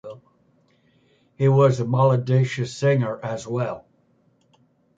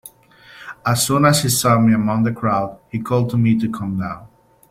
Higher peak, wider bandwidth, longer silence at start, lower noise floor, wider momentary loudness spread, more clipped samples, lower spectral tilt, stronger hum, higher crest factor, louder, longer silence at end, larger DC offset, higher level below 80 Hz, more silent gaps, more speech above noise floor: about the same, -4 dBFS vs -2 dBFS; second, 7.8 kHz vs 16.5 kHz; about the same, 0.05 s vs 0.05 s; first, -62 dBFS vs -47 dBFS; about the same, 12 LU vs 14 LU; neither; first, -7.5 dB/octave vs -5 dB/octave; neither; about the same, 18 dB vs 16 dB; second, -21 LUFS vs -18 LUFS; first, 1.2 s vs 0.45 s; neither; second, -62 dBFS vs -50 dBFS; neither; first, 42 dB vs 29 dB